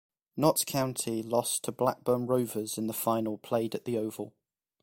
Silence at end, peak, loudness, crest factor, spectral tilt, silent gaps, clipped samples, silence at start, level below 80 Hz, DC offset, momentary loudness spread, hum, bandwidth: 0.55 s; -10 dBFS; -30 LUFS; 22 dB; -4.5 dB/octave; none; under 0.1%; 0.35 s; -68 dBFS; under 0.1%; 6 LU; none; 16.5 kHz